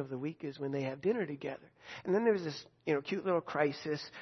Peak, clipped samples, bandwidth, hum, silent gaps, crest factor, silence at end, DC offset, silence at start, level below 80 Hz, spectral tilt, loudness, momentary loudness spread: -16 dBFS; under 0.1%; 6.2 kHz; none; none; 18 dB; 0 s; under 0.1%; 0 s; -78 dBFS; -5 dB/octave; -35 LUFS; 11 LU